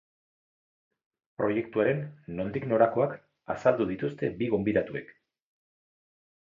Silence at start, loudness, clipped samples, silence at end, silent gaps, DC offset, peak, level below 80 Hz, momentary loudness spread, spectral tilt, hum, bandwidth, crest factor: 1.4 s; -29 LUFS; under 0.1%; 1.45 s; none; under 0.1%; -8 dBFS; -62 dBFS; 12 LU; -8.5 dB/octave; none; 7.4 kHz; 22 dB